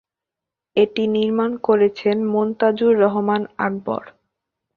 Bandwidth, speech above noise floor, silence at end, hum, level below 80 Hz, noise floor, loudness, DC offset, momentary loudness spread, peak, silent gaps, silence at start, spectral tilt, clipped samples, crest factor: 4.8 kHz; 68 dB; 0.65 s; none; -64 dBFS; -86 dBFS; -19 LUFS; under 0.1%; 8 LU; -2 dBFS; none; 0.75 s; -8 dB/octave; under 0.1%; 16 dB